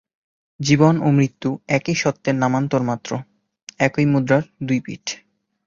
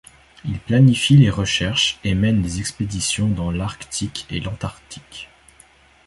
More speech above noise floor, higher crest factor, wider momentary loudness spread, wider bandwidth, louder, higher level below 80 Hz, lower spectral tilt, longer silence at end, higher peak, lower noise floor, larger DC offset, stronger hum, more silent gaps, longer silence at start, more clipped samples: second, 27 dB vs 32 dB; about the same, 18 dB vs 18 dB; second, 14 LU vs 21 LU; second, 7.6 kHz vs 11.5 kHz; about the same, -20 LUFS vs -19 LUFS; second, -56 dBFS vs -38 dBFS; about the same, -6 dB/octave vs -5 dB/octave; second, 0.5 s vs 0.8 s; about the same, -2 dBFS vs -2 dBFS; second, -45 dBFS vs -51 dBFS; neither; neither; first, 3.63-3.67 s vs none; first, 0.6 s vs 0.45 s; neither